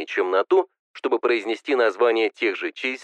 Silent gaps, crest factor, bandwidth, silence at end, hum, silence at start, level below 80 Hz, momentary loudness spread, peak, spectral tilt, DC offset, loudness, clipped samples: 0.79-0.94 s; 14 dB; 8.8 kHz; 0 s; none; 0 s; under -90 dBFS; 7 LU; -8 dBFS; -3 dB/octave; under 0.1%; -22 LUFS; under 0.1%